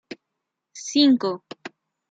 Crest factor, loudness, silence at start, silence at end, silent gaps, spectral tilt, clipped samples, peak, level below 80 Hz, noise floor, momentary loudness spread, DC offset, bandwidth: 20 dB; -20 LUFS; 0.1 s; 0.4 s; none; -3.5 dB/octave; under 0.1%; -4 dBFS; -76 dBFS; -82 dBFS; 24 LU; under 0.1%; 8 kHz